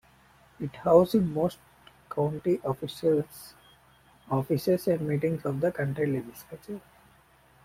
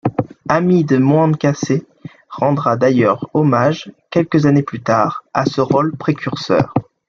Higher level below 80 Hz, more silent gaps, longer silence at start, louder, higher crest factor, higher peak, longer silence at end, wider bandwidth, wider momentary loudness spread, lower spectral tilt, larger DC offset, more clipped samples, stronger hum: second, -62 dBFS vs -54 dBFS; neither; first, 0.6 s vs 0.05 s; second, -28 LUFS vs -16 LUFS; first, 22 dB vs 14 dB; second, -6 dBFS vs 0 dBFS; first, 0.85 s vs 0.25 s; first, 16.5 kHz vs 7.2 kHz; first, 19 LU vs 7 LU; about the same, -7.5 dB/octave vs -7.5 dB/octave; neither; neither; neither